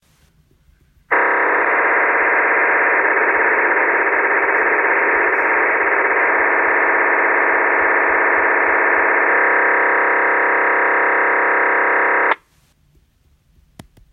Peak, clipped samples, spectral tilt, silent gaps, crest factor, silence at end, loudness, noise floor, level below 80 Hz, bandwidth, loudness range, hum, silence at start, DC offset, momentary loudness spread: -2 dBFS; under 0.1%; -6 dB/octave; none; 14 dB; 1.75 s; -14 LUFS; -57 dBFS; -56 dBFS; 4.1 kHz; 2 LU; none; 1.1 s; under 0.1%; 1 LU